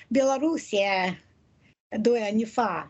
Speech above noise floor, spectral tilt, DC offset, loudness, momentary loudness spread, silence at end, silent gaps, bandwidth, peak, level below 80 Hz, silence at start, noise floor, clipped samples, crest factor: 37 dB; -4.5 dB/octave; under 0.1%; -25 LUFS; 7 LU; 0 s; 1.80-1.90 s; 8.4 kHz; -10 dBFS; -68 dBFS; 0.1 s; -62 dBFS; under 0.1%; 16 dB